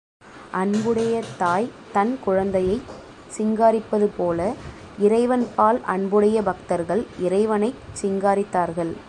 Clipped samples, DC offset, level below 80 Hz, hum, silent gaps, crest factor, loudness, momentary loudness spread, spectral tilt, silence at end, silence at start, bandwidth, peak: under 0.1%; under 0.1%; -50 dBFS; none; none; 18 dB; -22 LUFS; 9 LU; -6.5 dB/octave; 0 s; 0.25 s; 11.5 kHz; -4 dBFS